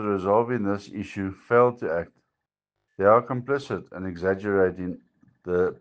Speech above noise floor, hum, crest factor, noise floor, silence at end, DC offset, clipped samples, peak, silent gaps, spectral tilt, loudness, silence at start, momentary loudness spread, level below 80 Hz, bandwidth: 59 dB; none; 22 dB; -84 dBFS; 0.05 s; under 0.1%; under 0.1%; -4 dBFS; none; -8 dB/octave; -25 LUFS; 0 s; 15 LU; -60 dBFS; 8 kHz